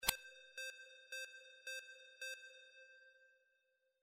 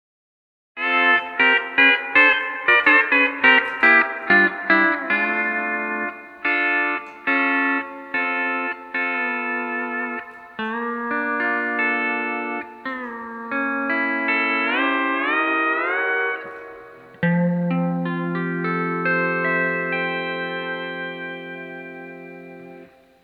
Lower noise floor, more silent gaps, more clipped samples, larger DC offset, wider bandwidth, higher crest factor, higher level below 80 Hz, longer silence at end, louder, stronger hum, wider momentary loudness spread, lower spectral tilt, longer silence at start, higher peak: first, -83 dBFS vs -46 dBFS; neither; neither; neither; first, 15.5 kHz vs 6 kHz; first, 34 dB vs 20 dB; about the same, -70 dBFS vs -68 dBFS; first, 0.65 s vs 0.35 s; second, -49 LUFS vs -19 LUFS; neither; about the same, 14 LU vs 16 LU; second, 0.5 dB/octave vs -7 dB/octave; second, 0 s vs 0.75 s; second, -16 dBFS vs -2 dBFS